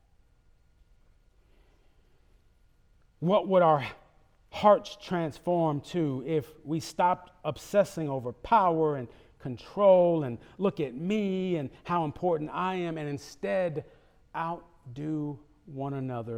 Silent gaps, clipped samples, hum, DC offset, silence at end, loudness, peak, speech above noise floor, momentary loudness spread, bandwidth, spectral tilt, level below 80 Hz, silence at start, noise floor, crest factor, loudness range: none; under 0.1%; none; under 0.1%; 0 s; -29 LUFS; -8 dBFS; 35 dB; 16 LU; 15.5 kHz; -7 dB/octave; -62 dBFS; 3.2 s; -63 dBFS; 20 dB; 7 LU